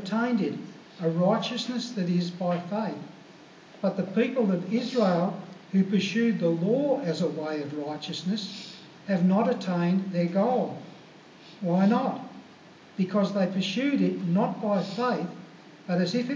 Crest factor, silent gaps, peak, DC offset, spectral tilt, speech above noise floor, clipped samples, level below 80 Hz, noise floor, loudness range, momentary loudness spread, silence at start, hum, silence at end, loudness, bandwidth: 16 dB; none; -12 dBFS; under 0.1%; -7 dB/octave; 25 dB; under 0.1%; -82 dBFS; -51 dBFS; 3 LU; 14 LU; 0 s; none; 0 s; -27 LUFS; 7.6 kHz